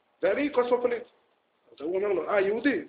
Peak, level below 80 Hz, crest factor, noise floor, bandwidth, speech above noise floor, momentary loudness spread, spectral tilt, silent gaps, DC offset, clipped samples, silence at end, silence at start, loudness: -12 dBFS; -68 dBFS; 16 dB; -68 dBFS; 4.8 kHz; 41 dB; 8 LU; -3.5 dB/octave; none; under 0.1%; under 0.1%; 0 s; 0.2 s; -27 LUFS